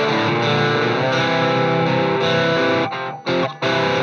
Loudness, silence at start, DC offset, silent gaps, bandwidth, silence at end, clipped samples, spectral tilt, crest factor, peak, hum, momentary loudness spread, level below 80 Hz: -18 LUFS; 0 s; under 0.1%; none; 9 kHz; 0 s; under 0.1%; -5.5 dB/octave; 14 dB; -4 dBFS; none; 4 LU; -66 dBFS